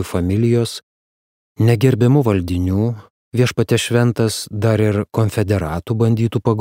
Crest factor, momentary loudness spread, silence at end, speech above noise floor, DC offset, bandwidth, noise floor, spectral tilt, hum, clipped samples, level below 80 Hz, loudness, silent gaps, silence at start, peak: 14 dB; 7 LU; 0 s; over 74 dB; under 0.1%; 16 kHz; under -90 dBFS; -6.5 dB/octave; none; under 0.1%; -42 dBFS; -17 LUFS; 0.83-1.55 s, 3.10-3.32 s; 0 s; -2 dBFS